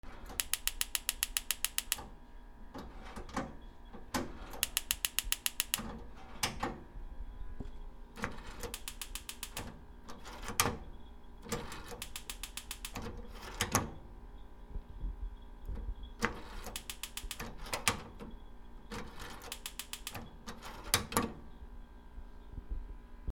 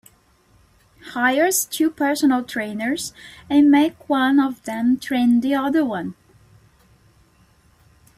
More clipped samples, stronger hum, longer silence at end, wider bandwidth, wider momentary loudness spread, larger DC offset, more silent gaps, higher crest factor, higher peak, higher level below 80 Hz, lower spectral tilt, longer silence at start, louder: neither; neither; second, 0 s vs 2.05 s; first, over 20 kHz vs 16 kHz; first, 21 LU vs 10 LU; neither; neither; first, 34 dB vs 16 dB; about the same, -8 dBFS vs -6 dBFS; first, -48 dBFS vs -60 dBFS; second, -2 dB/octave vs -3.5 dB/octave; second, 0.05 s vs 1.05 s; second, -38 LUFS vs -19 LUFS